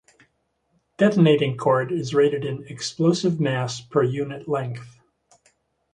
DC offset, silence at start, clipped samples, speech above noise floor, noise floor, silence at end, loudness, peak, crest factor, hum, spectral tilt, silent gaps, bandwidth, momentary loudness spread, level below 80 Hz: under 0.1%; 1 s; under 0.1%; 49 dB; -70 dBFS; 1.05 s; -22 LUFS; -6 dBFS; 18 dB; none; -6.5 dB/octave; none; 10.5 kHz; 12 LU; -64 dBFS